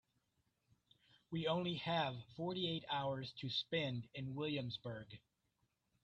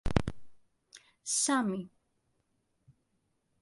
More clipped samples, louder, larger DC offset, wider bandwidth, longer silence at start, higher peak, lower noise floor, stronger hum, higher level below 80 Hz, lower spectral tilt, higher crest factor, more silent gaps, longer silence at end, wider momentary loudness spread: neither; second, -42 LUFS vs -32 LUFS; neither; second, 8.2 kHz vs 11.5 kHz; first, 1.3 s vs 0.05 s; second, -26 dBFS vs -8 dBFS; first, -84 dBFS vs -77 dBFS; neither; second, -76 dBFS vs -48 dBFS; first, -7 dB/octave vs -3.5 dB/octave; second, 18 dB vs 28 dB; neither; second, 0.85 s vs 1.75 s; second, 9 LU vs 16 LU